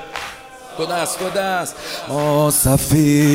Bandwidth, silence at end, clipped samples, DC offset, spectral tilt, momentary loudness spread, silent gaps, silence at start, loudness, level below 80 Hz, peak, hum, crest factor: 16 kHz; 0 s; under 0.1%; under 0.1%; -5 dB/octave; 15 LU; none; 0 s; -17 LUFS; -38 dBFS; -2 dBFS; none; 16 dB